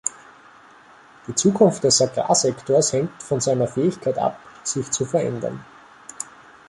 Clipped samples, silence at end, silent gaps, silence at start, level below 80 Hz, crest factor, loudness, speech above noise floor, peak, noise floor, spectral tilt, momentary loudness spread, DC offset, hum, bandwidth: under 0.1%; 0.45 s; none; 0.05 s; -60 dBFS; 20 dB; -21 LUFS; 28 dB; -2 dBFS; -49 dBFS; -4 dB/octave; 17 LU; under 0.1%; none; 11.5 kHz